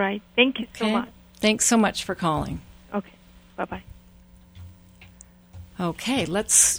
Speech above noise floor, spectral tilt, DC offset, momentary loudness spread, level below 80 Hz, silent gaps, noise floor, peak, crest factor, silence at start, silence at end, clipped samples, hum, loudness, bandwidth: 28 dB; -2.5 dB/octave; under 0.1%; 17 LU; -50 dBFS; none; -51 dBFS; -2 dBFS; 24 dB; 0 s; 0 s; under 0.1%; none; -23 LUFS; over 20 kHz